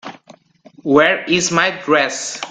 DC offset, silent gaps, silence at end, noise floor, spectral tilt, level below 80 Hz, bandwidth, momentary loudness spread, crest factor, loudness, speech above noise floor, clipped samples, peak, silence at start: under 0.1%; none; 0 s; -47 dBFS; -3 dB/octave; -58 dBFS; 9.6 kHz; 12 LU; 18 dB; -15 LUFS; 31 dB; under 0.1%; 0 dBFS; 0.05 s